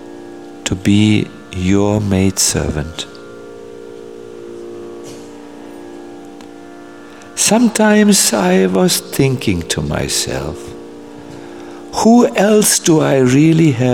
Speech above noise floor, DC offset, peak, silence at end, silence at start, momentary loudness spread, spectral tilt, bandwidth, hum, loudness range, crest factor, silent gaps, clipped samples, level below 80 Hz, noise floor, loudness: 23 dB; 0.5%; 0 dBFS; 0 s; 0 s; 23 LU; -4.5 dB/octave; 17 kHz; none; 19 LU; 14 dB; none; under 0.1%; -40 dBFS; -35 dBFS; -13 LUFS